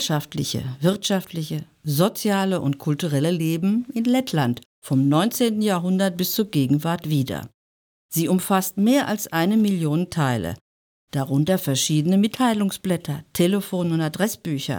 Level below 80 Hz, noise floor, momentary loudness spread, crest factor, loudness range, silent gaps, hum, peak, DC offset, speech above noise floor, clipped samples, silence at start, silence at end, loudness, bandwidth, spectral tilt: -60 dBFS; under -90 dBFS; 8 LU; 16 dB; 1 LU; 4.66-4.82 s, 7.54-8.09 s, 10.61-11.08 s; none; -6 dBFS; under 0.1%; over 68 dB; under 0.1%; 0 s; 0 s; -22 LUFS; over 20 kHz; -5.5 dB/octave